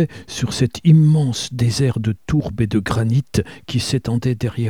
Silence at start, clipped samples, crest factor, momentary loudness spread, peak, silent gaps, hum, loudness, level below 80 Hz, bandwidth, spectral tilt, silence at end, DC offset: 0 s; under 0.1%; 14 dB; 10 LU; -2 dBFS; none; none; -18 LUFS; -40 dBFS; 13.5 kHz; -6.5 dB/octave; 0 s; 0.4%